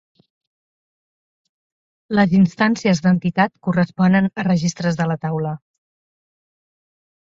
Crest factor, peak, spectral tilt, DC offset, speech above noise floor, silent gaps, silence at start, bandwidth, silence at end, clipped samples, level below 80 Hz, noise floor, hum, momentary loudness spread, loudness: 20 dB; -2 dBFS; -6.5 dB/octave; under 0.1%; over 73 dB; none; 2.1 s; 7.6 kHz; 1.85 s; under 0.1%; -56 dBFS; under -90 dBFS; none; 8 LU; -18 LUFS